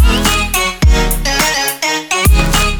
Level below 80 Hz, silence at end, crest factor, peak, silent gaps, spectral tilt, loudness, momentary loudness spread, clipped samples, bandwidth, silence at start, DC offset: -14 dBFS; 0 s; 12 dB; 0 dBFS; none; -3.5 dB/octave; -12 LUFS; 3 LU; under 0.1%; over 20 kHz; 0 s; under 0.1%